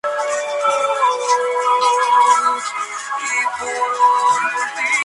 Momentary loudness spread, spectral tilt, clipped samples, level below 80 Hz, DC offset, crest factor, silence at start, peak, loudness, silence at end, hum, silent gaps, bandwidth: 8 LU; 0.5 dB/octave; under 0.1%; -68 dBFS; under 0.1%; 14 dB; 0.05 s; -2 dBFS; -17 LUFS; 0 s; none; none; 11.5 kHz